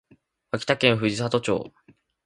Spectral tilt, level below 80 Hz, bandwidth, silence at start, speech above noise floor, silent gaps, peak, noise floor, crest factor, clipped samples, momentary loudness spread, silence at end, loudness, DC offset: -5 dB/octave; -58 dBFS; 11.5 kHz; 0.55 s; 37 dB; none; -2 dBFS; -60 dBFS; 24 dB; under 0.1%; 12 LU; 0.55 s; -24 LUFS; under 0.1%